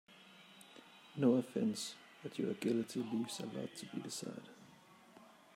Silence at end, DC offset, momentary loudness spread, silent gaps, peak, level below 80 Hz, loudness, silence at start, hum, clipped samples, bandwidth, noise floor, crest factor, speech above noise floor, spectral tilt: 0.3 s; under 0.1%; 24 LU; none; -20 dBFS; -88 dBFS; -39 LUFS; 0.1 s; none; under 0.1%; 16 kHz; -63 dBFS; 20 dB; 24 dB; -5 dB/octave